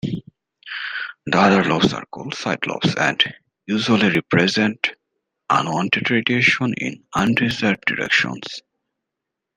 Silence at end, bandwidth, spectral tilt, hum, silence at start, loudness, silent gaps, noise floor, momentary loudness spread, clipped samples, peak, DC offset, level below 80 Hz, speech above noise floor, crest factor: 1 s; 10 kHz; -5 dB/octave; none; 0.05 s; -19 LUFS; none; -82 dBFS; 13 LU; under 0.1%; 0 dBFS; under 0.1%; -56 dBFS; 63 dB; 20 dB